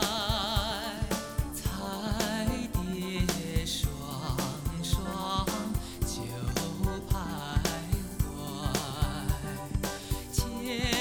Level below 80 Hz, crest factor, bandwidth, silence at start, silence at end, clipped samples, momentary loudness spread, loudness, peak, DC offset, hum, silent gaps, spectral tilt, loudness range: -38 dBFS; 20 dB; 17.5 kHz; 0 s; 0 s; under 0.1%; 5 LU; -32 LUFS; -12 dBFS; under 0.1%; none; none; -4.5 dB/octave; 1 LU